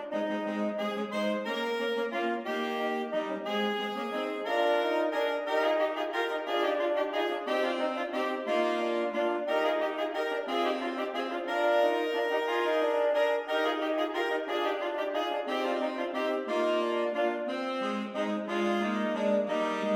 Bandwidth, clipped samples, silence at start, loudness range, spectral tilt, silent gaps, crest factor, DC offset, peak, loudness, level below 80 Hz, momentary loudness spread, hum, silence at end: 16 kHz; under 0.1%; 0 s; 3 LU; -4.5 dB/octave; none; 16 dB; under 0.1%; -14 dBFS; -30 LUFS; -80 dBFS; 5 LU; none; 0 s